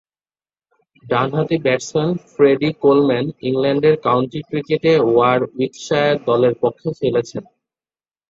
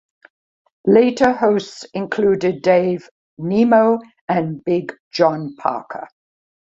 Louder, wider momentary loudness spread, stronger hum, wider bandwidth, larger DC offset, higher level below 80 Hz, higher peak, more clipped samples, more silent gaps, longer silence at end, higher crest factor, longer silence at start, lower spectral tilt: about the same, -17 LUFS vs -18 LUFS; second, 8 LU vs 14 LU; neither; about the same, 7.8 kHz vs 7.8 kHz; neither; about the same, -58 dBFS vs -58 dBFS; about the same, -2 dBFS vs -2 dBFS; neither; second, none vs 3.11-3.37 s, 4.21-4.28 s, 5.00-5.11 s; first, 0.85 s vs 0.6 s; about the same, 16 dB vs 16 dB; first, 1.05 s vs 0.85 s; about the same, -6.5 dB/octave vs -6.5 dB/octave